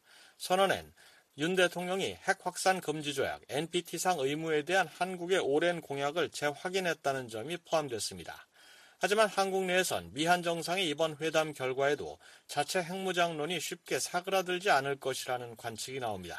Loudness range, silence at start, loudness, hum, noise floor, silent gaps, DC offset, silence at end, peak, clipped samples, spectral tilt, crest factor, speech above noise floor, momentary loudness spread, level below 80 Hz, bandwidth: 2 LU; 0.4 s; -32 LUFS; none; -59 dBFS; none; under 0.1%; 0 s; -12 dBFS; under 0.1%; -3.5 dB/octave; 20 dB; 26 dB; 9 LU; -72 dBFS; 14.5 kHz